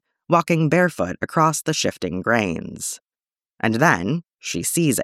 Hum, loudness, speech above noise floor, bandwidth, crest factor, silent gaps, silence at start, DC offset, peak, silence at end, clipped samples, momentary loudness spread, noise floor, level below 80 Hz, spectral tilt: none; -21 LUFS; over 70 dB; 16 kHz; 18 dB; none; 0.3 s; under 0.1%; -2 dBFS; 0 s; under 0.1%; 11 LU; under -90 dBFS; -56 dBFS; -4.5 dB/octave